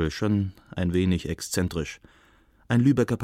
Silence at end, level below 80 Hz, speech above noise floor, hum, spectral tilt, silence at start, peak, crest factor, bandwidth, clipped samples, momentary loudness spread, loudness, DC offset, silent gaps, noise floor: 0 s; -44 dBFS; 34 dB; none; -6 dB/octave; 0 s; -10 dBFS; 16 dB; 16 kHz; under 0.1%; 11 LU; -26 LUFS; under 0.1%; none; -59 dBFS